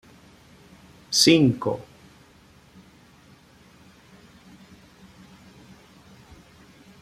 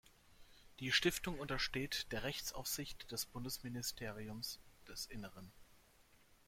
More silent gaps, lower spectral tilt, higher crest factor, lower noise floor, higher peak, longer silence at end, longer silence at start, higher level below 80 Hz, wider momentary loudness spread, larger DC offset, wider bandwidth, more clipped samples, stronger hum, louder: neither; about the same, -4 dB/octave vs -3 dB/octave; about the same, 26 dB vs 24 dB; second, -54 dBFS vs -69 dBFS; first, -4 dBFS vs -20 dBFS; first, 5.2 s vs 0.15 s; first, 1.1 s vs 0.05 s; about the same, -60 dBFS vs -60 dBFS; second, 14 LU vs 17 LU; neither; about the same, 15.5 kHz vs 16.5 kHz; neither; neither; first, -20 LUFS vs -42 LUFS